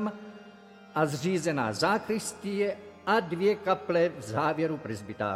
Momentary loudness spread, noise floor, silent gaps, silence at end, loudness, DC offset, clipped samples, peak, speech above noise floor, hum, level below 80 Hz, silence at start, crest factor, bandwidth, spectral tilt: 10 LU; -51 dBFS; none; 0 s; -29 LUFS; under 0.1%; under 0.1%; -12 dBFS; 23 dB; none; -68 dBFS; 0 s; 18 dB; 16 kHz; -5 dB/octave